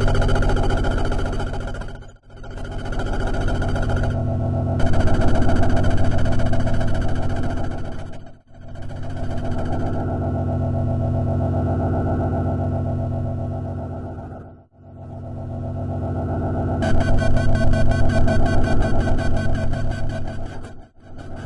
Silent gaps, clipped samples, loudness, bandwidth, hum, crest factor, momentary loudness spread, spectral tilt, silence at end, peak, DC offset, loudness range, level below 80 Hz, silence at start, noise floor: none; under 0.1%; -23 LUFS; 9.8 kHz; none; 14 dB; 15 LU; -7.5 dB/octave; 0 s; -4 dBFS; under 0.1%; 7 LU; -24 dBFS; 0 s; -43 dBFS